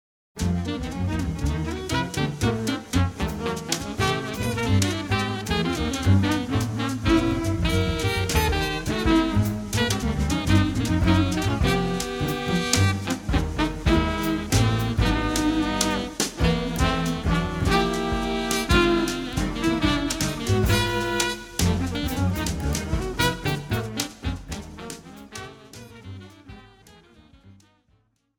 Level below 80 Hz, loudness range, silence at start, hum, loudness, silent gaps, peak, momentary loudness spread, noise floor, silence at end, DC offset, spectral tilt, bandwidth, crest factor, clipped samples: -34 dBFS; 6 LU; 0.35 s; none; -24 LUFS; none; -2 dBFS; 8 LU; -65 dBFS; 0.85 s; under 0.1%; -5 dB/octave; 19.5 kHz; 20 dB; under 0.1%